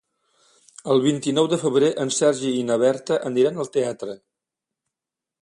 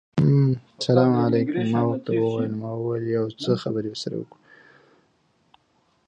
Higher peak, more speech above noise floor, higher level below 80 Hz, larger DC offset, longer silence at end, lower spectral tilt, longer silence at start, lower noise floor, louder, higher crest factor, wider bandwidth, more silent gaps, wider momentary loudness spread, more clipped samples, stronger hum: about the same, -6 dBFS vs -4 dBFS; first, 67 dB vs 43 dB; second, -68 dBFS vs -60 dBFS; neither; second, 1.25 s vs 1.85 s; second, -4.5 dB/octave vs -8 dB/octave; first, 0.85 s vs 0.15 s; first, -87 dBFS vs -66 dBFS; about the same, -21 LUFS vs -23 LUFS; about the same, 18 dB vs 20 dB; first, 11.5 kHz vs 8.8 kHz; neither; about the same, 10 LU vs 11 LU; neither; neither